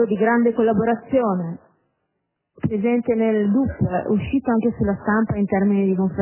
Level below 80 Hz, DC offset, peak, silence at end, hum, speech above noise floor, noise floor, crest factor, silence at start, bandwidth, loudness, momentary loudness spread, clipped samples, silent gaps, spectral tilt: -44 dBFS; under 0.1%; -6 dBFS; 0 s; none; 57 dB; -76 dBFS; 14 dB; 0 s; 3.2 kHz; -20 LUFS; 5 LU; under 0.1%; none; -12.5 dB/octave